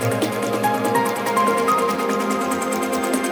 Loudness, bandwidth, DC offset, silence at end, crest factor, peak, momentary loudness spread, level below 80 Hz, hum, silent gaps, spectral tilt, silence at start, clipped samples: -20 LUFS; over 20 kHz; under 0.1%; 0 s; 14 dB; -6 dBFS; 4 LU; -60 dBFS; none; none; -4.5 dB/octave; 0 s; under 0.1%